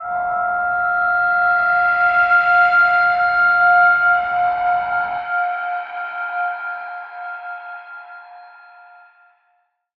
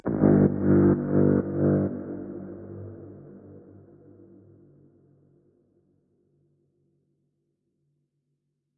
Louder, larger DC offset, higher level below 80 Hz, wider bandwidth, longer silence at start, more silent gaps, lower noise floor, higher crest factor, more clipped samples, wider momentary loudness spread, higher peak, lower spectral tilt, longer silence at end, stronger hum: first, -16 LUFS vs -23 LUFS; neither; about the same, -56 dBFS vs -54 dBFS; first, 5.6 kHz vs 2.4 kHz; about the same, 0 s vs 0.05 s; neither; second, -65 dBFS vs -78 dBFS; second, 14 dB vs 20 dB; neither; second, 18 LU vs 24 LU; about the same, -4 dBFS vs -6 dBFS; second, -4.5 dB/octave vs -15.5 dB/octave; second, 1.5 s vs 5.2 s; neither